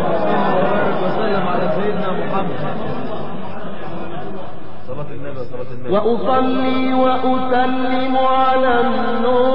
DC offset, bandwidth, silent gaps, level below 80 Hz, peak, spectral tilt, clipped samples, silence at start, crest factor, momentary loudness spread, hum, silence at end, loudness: 10%; 5.6 kHz; none; -50 dBFS; -2 dBFS; -9.5 dB/octave; under 0.1%; 0 s; 14 dB; 14 LU; none; 0 s; -18 LUFS